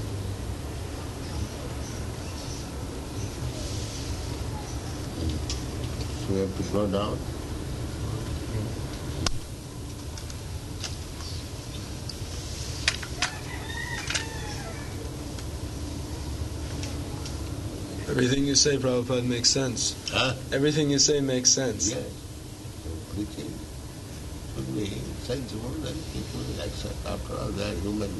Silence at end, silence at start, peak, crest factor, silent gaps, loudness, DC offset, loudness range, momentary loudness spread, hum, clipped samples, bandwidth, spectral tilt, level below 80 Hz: 0 s; 0 s; -4 dBFS; 26 dB; none; -29 LUFS; under 0.1%; 11 LU; 15 LU; none; under 0.1%; 12 kHz; -3.5 dB/octave; -40 dBFS